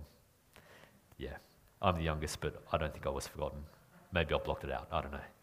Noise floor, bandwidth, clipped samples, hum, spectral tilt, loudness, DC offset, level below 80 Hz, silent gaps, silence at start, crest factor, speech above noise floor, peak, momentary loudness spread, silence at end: -66 dBFS; 15.5 kHz; under 0.1%; none; -5 dB/octave; -38 LUFS; under 0.1%; -50 dBFS; none; 0 s; 26 dB; 29 dB; -14 dBFS; 21 LU; 0.1 s